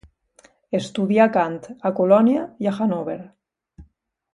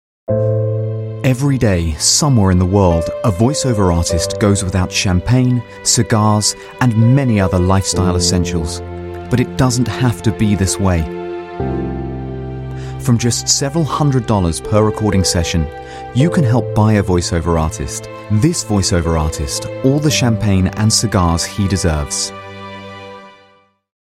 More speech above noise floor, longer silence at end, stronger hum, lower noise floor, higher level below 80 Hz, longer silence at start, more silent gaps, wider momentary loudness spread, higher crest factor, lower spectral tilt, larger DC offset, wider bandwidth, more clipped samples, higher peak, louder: about the same, 38 dB vs 37 dB; second, 0.5 s vs 0.7 s; neither; first, -57 dBFS vs -51 dBFS; second, -58 dBFS vs -30 dBFS; first, 0.7 s vs 0.3 s; neither; about the same, 11 LU vs 11 LU; first, 20 dB vs 14 dB; first, -7 dB/octave vs -5 dB/octave; neither; second, 10.5 kHz vs 15.5 kHz; neither; about the same, -2 dBFS vs 0 dBFS; second, -20 LUFS vs -15 LUFS